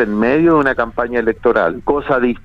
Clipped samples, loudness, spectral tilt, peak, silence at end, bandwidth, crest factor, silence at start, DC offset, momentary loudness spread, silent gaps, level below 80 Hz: under 0.1%; -15 LUFS; -8.5 dB/octave; 0 dBFS; 0.05 s; 5.8 kHz; 14 dB; 0 s; under 0.1%; 6 LU; none; -38 dBFS